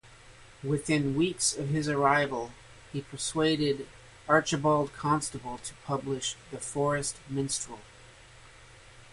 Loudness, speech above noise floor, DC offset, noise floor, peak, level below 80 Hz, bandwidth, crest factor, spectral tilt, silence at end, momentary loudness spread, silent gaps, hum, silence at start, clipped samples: -29 LUFS; 24 dB; under 0.1%; -53 dBFS; -8 dBFS; -58 dBFS; 11.5 kHz; 22 dB; -4 dB/octave; 0.05 s; 14 LU; none; none; 0.05 s; under 0.1%